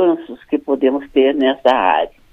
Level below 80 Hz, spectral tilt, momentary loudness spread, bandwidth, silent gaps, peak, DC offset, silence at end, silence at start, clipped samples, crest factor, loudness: -50 dBFS; -6 dB/octave; 9 LU; 6.6 kHz; none; 0 dBFS; under 0.1%; 0.25 s; 0 s; under 0.1%; 16 dB; -16 LUFS